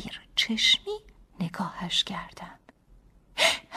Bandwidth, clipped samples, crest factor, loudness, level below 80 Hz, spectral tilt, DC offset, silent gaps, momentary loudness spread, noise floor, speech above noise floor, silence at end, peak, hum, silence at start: 15.5 kHz; under 0.1%; 22 dB; -25 LUFS; -56 dBFS; -2 dB/octave; under 0.1%; none; 19 LU; -57 dBFS; 29 dB; 0 s; -8 dBFS; none; 0 s